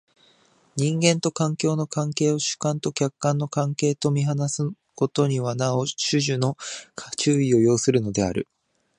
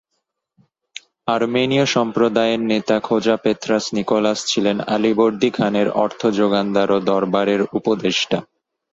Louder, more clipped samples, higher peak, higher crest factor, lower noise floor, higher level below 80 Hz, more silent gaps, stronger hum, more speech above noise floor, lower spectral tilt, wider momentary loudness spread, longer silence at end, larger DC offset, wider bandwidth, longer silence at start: second, -23 LUFS vs -18 LUFS; neither; about the same, -2 dBFS vs -2 dBFS; about the same, 20 dB vs 16 dB; second, -60 dBFS vs -75 dBFS; about the same, -58 dBFS vs -58 dBFS; neither; neither; second, 37 dB vs 57 dB; about the same, -5 dB/octave vs -5 dB/octave; first, 9 LU vs 4 LU; about the same, 0.55 s vs 0.5 s; neither; first, 11 kHz vs 8 kHz; second, 0.75 s vs 1.25 s